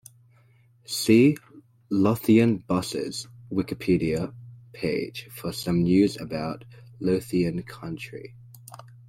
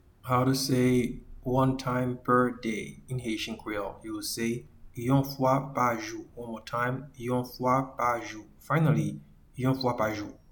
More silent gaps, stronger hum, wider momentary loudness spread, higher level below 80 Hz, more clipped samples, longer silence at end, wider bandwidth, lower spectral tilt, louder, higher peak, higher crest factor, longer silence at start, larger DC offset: neither; neither; first, 18 LU vs 13 LU; about the same, -54 dBFS vs -52 dBFS; neither; about the same, 0.25 s vs 0.2 s; second, 16.5 kHz vs 19 kHz; about the same, -6 dB/octave vs -6 dB/octave; first, -25 LUFS vs -29 LUFS; first, -6 dBFS vs -12 dBFS; about the same, 20 dB vs 18 dB; first, 0.9 s vs 0.25 s; neither